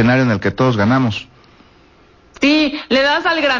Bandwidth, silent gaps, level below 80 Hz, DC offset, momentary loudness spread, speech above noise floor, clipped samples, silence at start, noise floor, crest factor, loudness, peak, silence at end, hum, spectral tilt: 7.4 kHz; none; -44 dBFS; under 0.1%; 4 LU; 34 dB; under 0.1%; 0 s; -48 dBFS; 12 dB; -15 LUFS; -4 dBFS; 0 s; none; -6 dB/octave